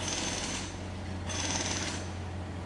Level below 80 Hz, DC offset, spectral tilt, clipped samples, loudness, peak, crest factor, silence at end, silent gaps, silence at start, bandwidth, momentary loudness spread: -50 dBFS; under 0.1%; -3 dB/octave; under 0.1%; -34 LUFS; -16 dBFS; 20 dB; 0 s; none; 0 s; 11.5 kHz; 8 LU